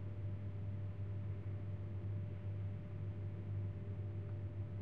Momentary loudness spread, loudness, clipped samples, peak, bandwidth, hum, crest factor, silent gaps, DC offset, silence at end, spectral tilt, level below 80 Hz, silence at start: 2 LU; -45 LUFS; under 0.1%; -34 dBFS; 3.7 kHz; none; 10 dB; none; 0.2%; 0 s; -10 dB/octave; -60 dBFS; 0 s